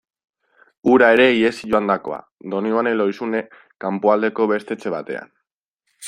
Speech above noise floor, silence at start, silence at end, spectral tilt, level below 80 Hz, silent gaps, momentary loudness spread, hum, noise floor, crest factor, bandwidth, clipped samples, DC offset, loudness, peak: 59 dB; 0.85 s; 0 s; -5.5 dB/octave; -62 dBFS; 2.32-2.38 s, 5.53-5.78 s; 16 LU; none; -77 dBFS; 18 dB; 11 kHz; under 0.1%; under 0.1%; -18 LUFS; -2 dBFS